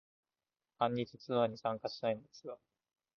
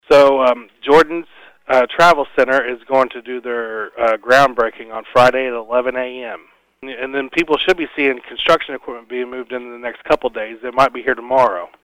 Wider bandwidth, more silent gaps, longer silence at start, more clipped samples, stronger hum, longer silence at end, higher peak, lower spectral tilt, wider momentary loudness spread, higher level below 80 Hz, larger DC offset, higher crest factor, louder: second, 6.8 kHz vs 16 kHz; neither; first, 0.8 s vs 0.1 s; neither; neither; first, 0.6 s vs 0.2 s; second, -18 dBFS vs -2 dBFS; about the same, -4.5 dB/octave vs -4.5 dB/octave; about the same, 15 LU vs 15 LU; second, -80 dBFS vs -48 dBFS; neither; first, 22 dB vs 14 dB; second, -37 LUFS vs -16 LUFS